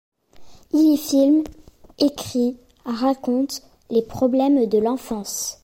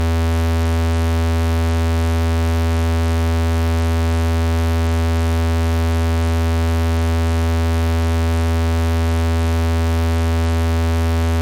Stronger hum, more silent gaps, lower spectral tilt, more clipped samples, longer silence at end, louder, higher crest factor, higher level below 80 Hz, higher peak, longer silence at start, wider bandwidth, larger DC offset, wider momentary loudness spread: neither; neither; second, -4.5 dB/octave vs -6.5 dB/octave; neither; about the same, 0.1 s vs 0 s; second, -21 LUFS vs -18 LUFS; first, 14 dB vs 4 dB; second, -52 dBFS vs -26 dBFS; first, -8 dBFS vs -12 dBFS; first, 0.4 s vs 0 s; about the same, 16.5 kHz vs 15.5 kHz; neither; first, 10 LU vs 0 LU